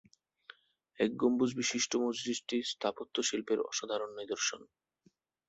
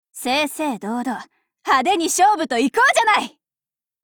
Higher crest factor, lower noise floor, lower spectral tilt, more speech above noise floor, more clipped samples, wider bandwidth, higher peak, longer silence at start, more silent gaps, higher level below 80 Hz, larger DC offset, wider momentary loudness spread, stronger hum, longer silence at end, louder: first, 20 dB vs 14 dB; second, -72 dBFS vs under -90 dBFS; about the same, -2.5 dB/octave vs -1.5 dB/octave; second, 38 dB vs over 72 dB; neither; second, 8.2 kHz vs over 20 kHz; second, -16 dBFS vs -6 dBFS; first, 1 s vs 0.15 s; neither; second, -76 dBFS vs -64 dBFS; neither; second, 7 LU vs 13 LU; neither; about the same, 0.85 s vs 0.75 s; second, -34 LUFS vs -18 LUFS